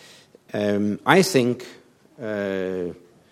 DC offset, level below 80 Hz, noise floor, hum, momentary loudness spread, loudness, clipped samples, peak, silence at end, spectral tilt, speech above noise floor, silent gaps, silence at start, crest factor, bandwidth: under 0.1%; -66 dBFS; -50 dBFS; none; 16 LU; -22 LUFS; under 0.1%; 0 dBFS; 0.35 s; -5 dB/octave; 28 dB; none; 0.55 s; 24 dB; 16 kHz